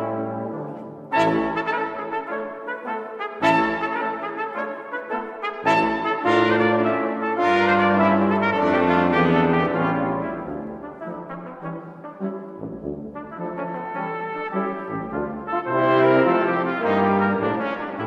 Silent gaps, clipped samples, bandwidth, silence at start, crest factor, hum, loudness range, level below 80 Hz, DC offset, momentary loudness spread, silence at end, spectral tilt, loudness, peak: none; under 0.1%; 8.8 kHz; 0 s; 18 dB; none; 12 LU; -56 dBFS; under 0.1%; 15 LU; 0 s; -7 dB/octave; -22 LUFS; -6 dBFS